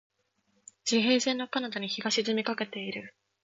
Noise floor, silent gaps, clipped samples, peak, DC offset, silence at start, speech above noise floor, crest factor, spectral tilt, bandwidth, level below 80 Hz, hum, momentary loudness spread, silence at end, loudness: -73 dBFS; none; under 0.1%; -14 dBFS; under 0.1%; 0.85 s; 44 dB; 18 dB; -3 dB/octave; 7.8 kHz; -78 dBFS; none; 11 LU; 0.35 s; -29 LUFS